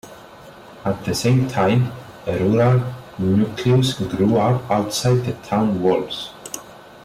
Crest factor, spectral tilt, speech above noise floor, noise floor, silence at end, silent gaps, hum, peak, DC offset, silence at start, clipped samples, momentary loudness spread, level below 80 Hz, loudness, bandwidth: 12 dB; -6.5 dB/octave; 23 dB; -41 dBFS; 0 s; none; none; -8 dBFS; under 0.1%; 0.05 s; under 0.1%; 12 LU; -50 dBFS; -19 LUFS; 15.5 kHz